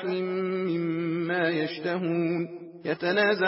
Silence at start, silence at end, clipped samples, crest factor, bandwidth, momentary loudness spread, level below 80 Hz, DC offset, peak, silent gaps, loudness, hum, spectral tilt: 0 s; 0 s; under 0.1%; 14 dB; 5.8 kHz; 7 LU; -82 dBFS; under 0.1%; -12 dBFS; none; -28 LUFS; none; -10 dB/octave